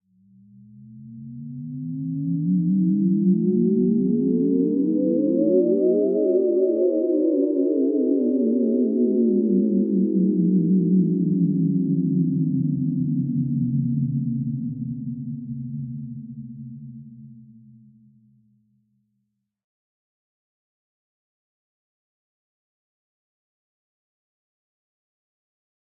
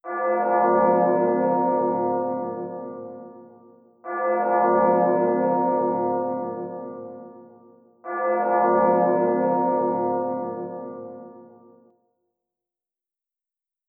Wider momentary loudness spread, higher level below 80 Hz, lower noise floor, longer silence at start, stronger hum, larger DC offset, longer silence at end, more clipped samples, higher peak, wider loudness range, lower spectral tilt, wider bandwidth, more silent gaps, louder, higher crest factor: second, 15 LU vs 19 LU; first, -68 dBFS vs under -90 dBFS; second, -76 dBFS vs -87 dBFS; first, 0.75 s vs 0.05 s; neither; neither; first, 8.55 s vs 2.45 s; neither; about the same, -8 dBFS vs -8 dBFS; first, 13 LU vs 7 LU; first, -19.5 dB/octave vs -13.5 dB/octave; second, 1.1 kHz vs 2.8 kHz; neither; about the same, -21 LUFS vs -22 LUFS; about the same, 16 dB vs 16 dB